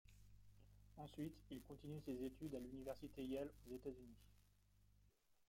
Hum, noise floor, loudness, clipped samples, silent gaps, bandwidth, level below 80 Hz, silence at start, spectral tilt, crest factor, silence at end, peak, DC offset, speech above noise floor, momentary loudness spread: 50 Hz at -65 dBFS; -77 dBFS; -53 LUFS; under 0.1%; none; 16.5 kHz; -70 dBFS; 0.05 s; -7 dB/octave; 18 dB; 0.05 s; -36 dBFS; under 0.1%; 24 dB; 10 LU